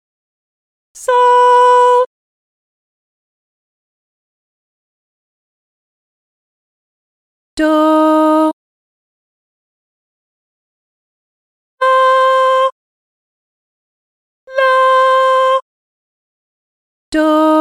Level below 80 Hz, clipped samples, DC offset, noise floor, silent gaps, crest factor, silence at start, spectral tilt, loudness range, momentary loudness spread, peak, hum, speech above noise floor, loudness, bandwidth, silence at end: -56 dBFS; under 0.1%; under 0.1%; under -90 dBFS; 2.06-7.57 s, 8.53-11.78 s, 12.72-14.47 s, 15.62-17.12 s; 14 dB; 0.95 s; -2.5 dB/octave; 6 LU; 10 LU; -2 dBFS; none; over 80 dB; -11 LUFS; 13.5 kHz; 0 s